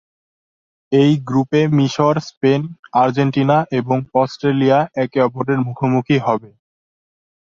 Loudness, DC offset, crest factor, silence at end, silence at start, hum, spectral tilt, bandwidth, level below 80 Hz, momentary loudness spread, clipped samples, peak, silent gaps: -17 LUFS; under 0.1%; 16 dB; 1 s; 0.9 s; none; -7.5 dB/octave; 7.4 kHz; -58 dBFS; 5 LU; under 0.1%; -2 dBFS; 2.37-2.41 s, 2.79-2.83 s